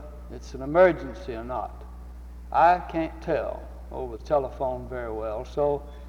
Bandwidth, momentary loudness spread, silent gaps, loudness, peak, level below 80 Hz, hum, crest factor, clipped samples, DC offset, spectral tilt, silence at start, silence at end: 8.6 kHz; 21 LU; none; -26 LUFS; -6 dBFS; -42 dBFS; none; 20 dB; under 0.1%; under 0.1%; -7 dB/octave; 0 s; 0 s